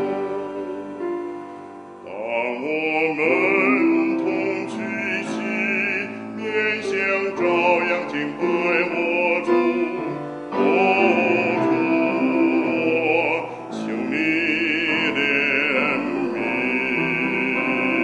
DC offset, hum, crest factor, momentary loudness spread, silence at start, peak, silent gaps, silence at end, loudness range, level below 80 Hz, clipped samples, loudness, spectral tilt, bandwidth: under 0.1%; none; 16 dB; 12 LU; 0 s; -4 dBFS; none; 0 s; 3 LU; -70 dBFS; under 0.1%; -21 LUFS; -5.5 dB/octave; 10 kHz